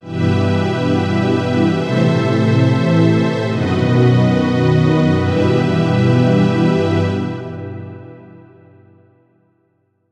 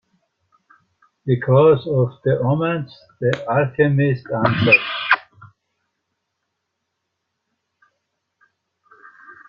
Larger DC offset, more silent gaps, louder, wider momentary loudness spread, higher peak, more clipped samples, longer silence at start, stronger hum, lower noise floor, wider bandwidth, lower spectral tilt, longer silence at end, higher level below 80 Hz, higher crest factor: neither; neither; first, -15 LUFS vs -18 LUFS; about the same, 9 LU vs 9 LU; about the same, -2 dBFS vs 0 dBFS; neither; second, 0.05 s vs 1.25 s; neither; second, -63 dBFS vs -77 dBFS; first, 9 kHz vs 7 kHz; about the same, -8 dB/octave vs -8.5 dB/octave; first, 1.9 s vs 0.15 s; first, -52 dBFS vs -58 dBFS; second, 12 dB vs 20 dB